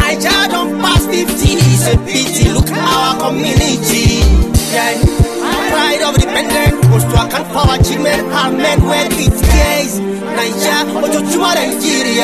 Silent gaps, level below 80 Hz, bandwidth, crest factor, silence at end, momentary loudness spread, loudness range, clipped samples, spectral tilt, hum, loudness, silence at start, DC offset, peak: none; -20 dBFS; 14 kHz; 10 dB; 0 s; 4 LU; 1 LU; under 0.1%; -4.5 dB/octave; none; -12 LUFS; 0 s; 0.5%; -2 dBFS